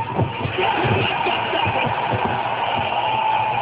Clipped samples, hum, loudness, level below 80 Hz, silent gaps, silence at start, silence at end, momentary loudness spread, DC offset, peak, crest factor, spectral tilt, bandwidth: under 0.1%; none; -20 LUFS; -44 dBFS; none; 0 s; 0 s; 3 LU; under 0.1%; -6 dBFS; 14 dB; -9.5 dB/octave; 4 kHz